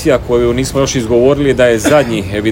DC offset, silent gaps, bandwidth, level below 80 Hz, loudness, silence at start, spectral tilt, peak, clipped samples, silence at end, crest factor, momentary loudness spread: under 0.1%; none; 17 kHz; -30 dBFS; -11 LUFS; 0 s; -5 dB/octave; 0 dBFS; 0.4%; 0 s; 12 dB; 4 LU